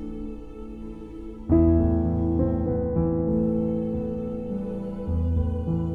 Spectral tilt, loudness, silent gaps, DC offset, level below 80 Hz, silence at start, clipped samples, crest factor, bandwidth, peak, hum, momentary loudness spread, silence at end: -12 dB/octave; -25 LUFS; none; under 0.1%; -34 dBFS; 0 s; under 0.1%; 16 dB; 3.3 kHz; -8 dBFS; none; 18 LU; 0 s